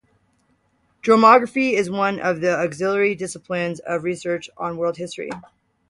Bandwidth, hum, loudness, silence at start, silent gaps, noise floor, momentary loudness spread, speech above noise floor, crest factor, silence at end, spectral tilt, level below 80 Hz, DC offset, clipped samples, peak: 11.5 kHz; none; -20 LUFS; 1.05 s; none; -65 dBFS; 16 LU; 45 dB; 20 dB; 0.5 s; -5 dB/octave; -64 dBFS; under 0.1%; under 0.1%; 0 dBFS